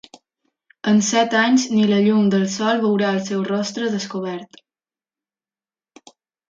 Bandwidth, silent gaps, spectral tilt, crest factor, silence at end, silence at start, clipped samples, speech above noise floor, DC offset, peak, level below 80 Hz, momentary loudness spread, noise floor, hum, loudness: 7.6 kHz; none; -4.5 dB/octave; 16 dB; 2.05 s; 0.85 s; under 0.1%; over 72 dB; under 0.1%; -4 dBFS; -68 dBFS; 11 LU; under -90 dBFS; none; -19 LUFS